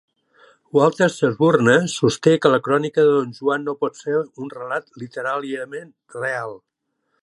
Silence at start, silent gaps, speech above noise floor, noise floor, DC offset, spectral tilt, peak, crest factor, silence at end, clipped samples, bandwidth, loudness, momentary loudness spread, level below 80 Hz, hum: 0.75 s; none; 52 dB; -72 dBFS; under 0.1%; -5.5 dB/octave; 0 dBFS; 20 dB; 0.65 s; under 0.1%; 11.5 kHz; -19 LUFS; 15 LU; -64 dBFS; none